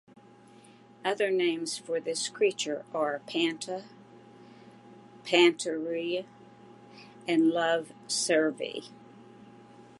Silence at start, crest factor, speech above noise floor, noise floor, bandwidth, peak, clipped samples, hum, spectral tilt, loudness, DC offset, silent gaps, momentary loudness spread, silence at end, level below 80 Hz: 1.05 s; 22 dB; 26 dB; -55 dBFS; 11.5 kHz; -8 dBFS; under 0.1%; none; -3 dB/octave; -29 LUFS; under 0.1%; none; 16 LU; 0.15 s; -84 dBFS